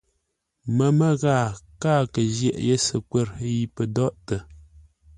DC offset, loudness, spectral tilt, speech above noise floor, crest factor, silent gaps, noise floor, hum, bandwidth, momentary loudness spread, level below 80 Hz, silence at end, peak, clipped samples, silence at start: under 0.1%; -23 LUFS; -6 dB/octave; 53 dB; 16 dB; none; -76 dBFS; none; 11 kHz; 10 LU; -50 dBFS; 0.6 s; -8 dBFS; under 0.1%; 0.65 s